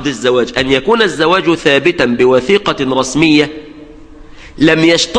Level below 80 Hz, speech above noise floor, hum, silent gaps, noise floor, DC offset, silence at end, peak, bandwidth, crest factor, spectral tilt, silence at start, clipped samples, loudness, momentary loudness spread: -40 dBFS; 23 dB; none; none; -34 dBFS; under 0.1%; 0 s; 0 dBFS; 10.5 kHz; 12 dB; -4.5 dB/octave; 0 s; under 0.1%; -11 LUFS; 4 LU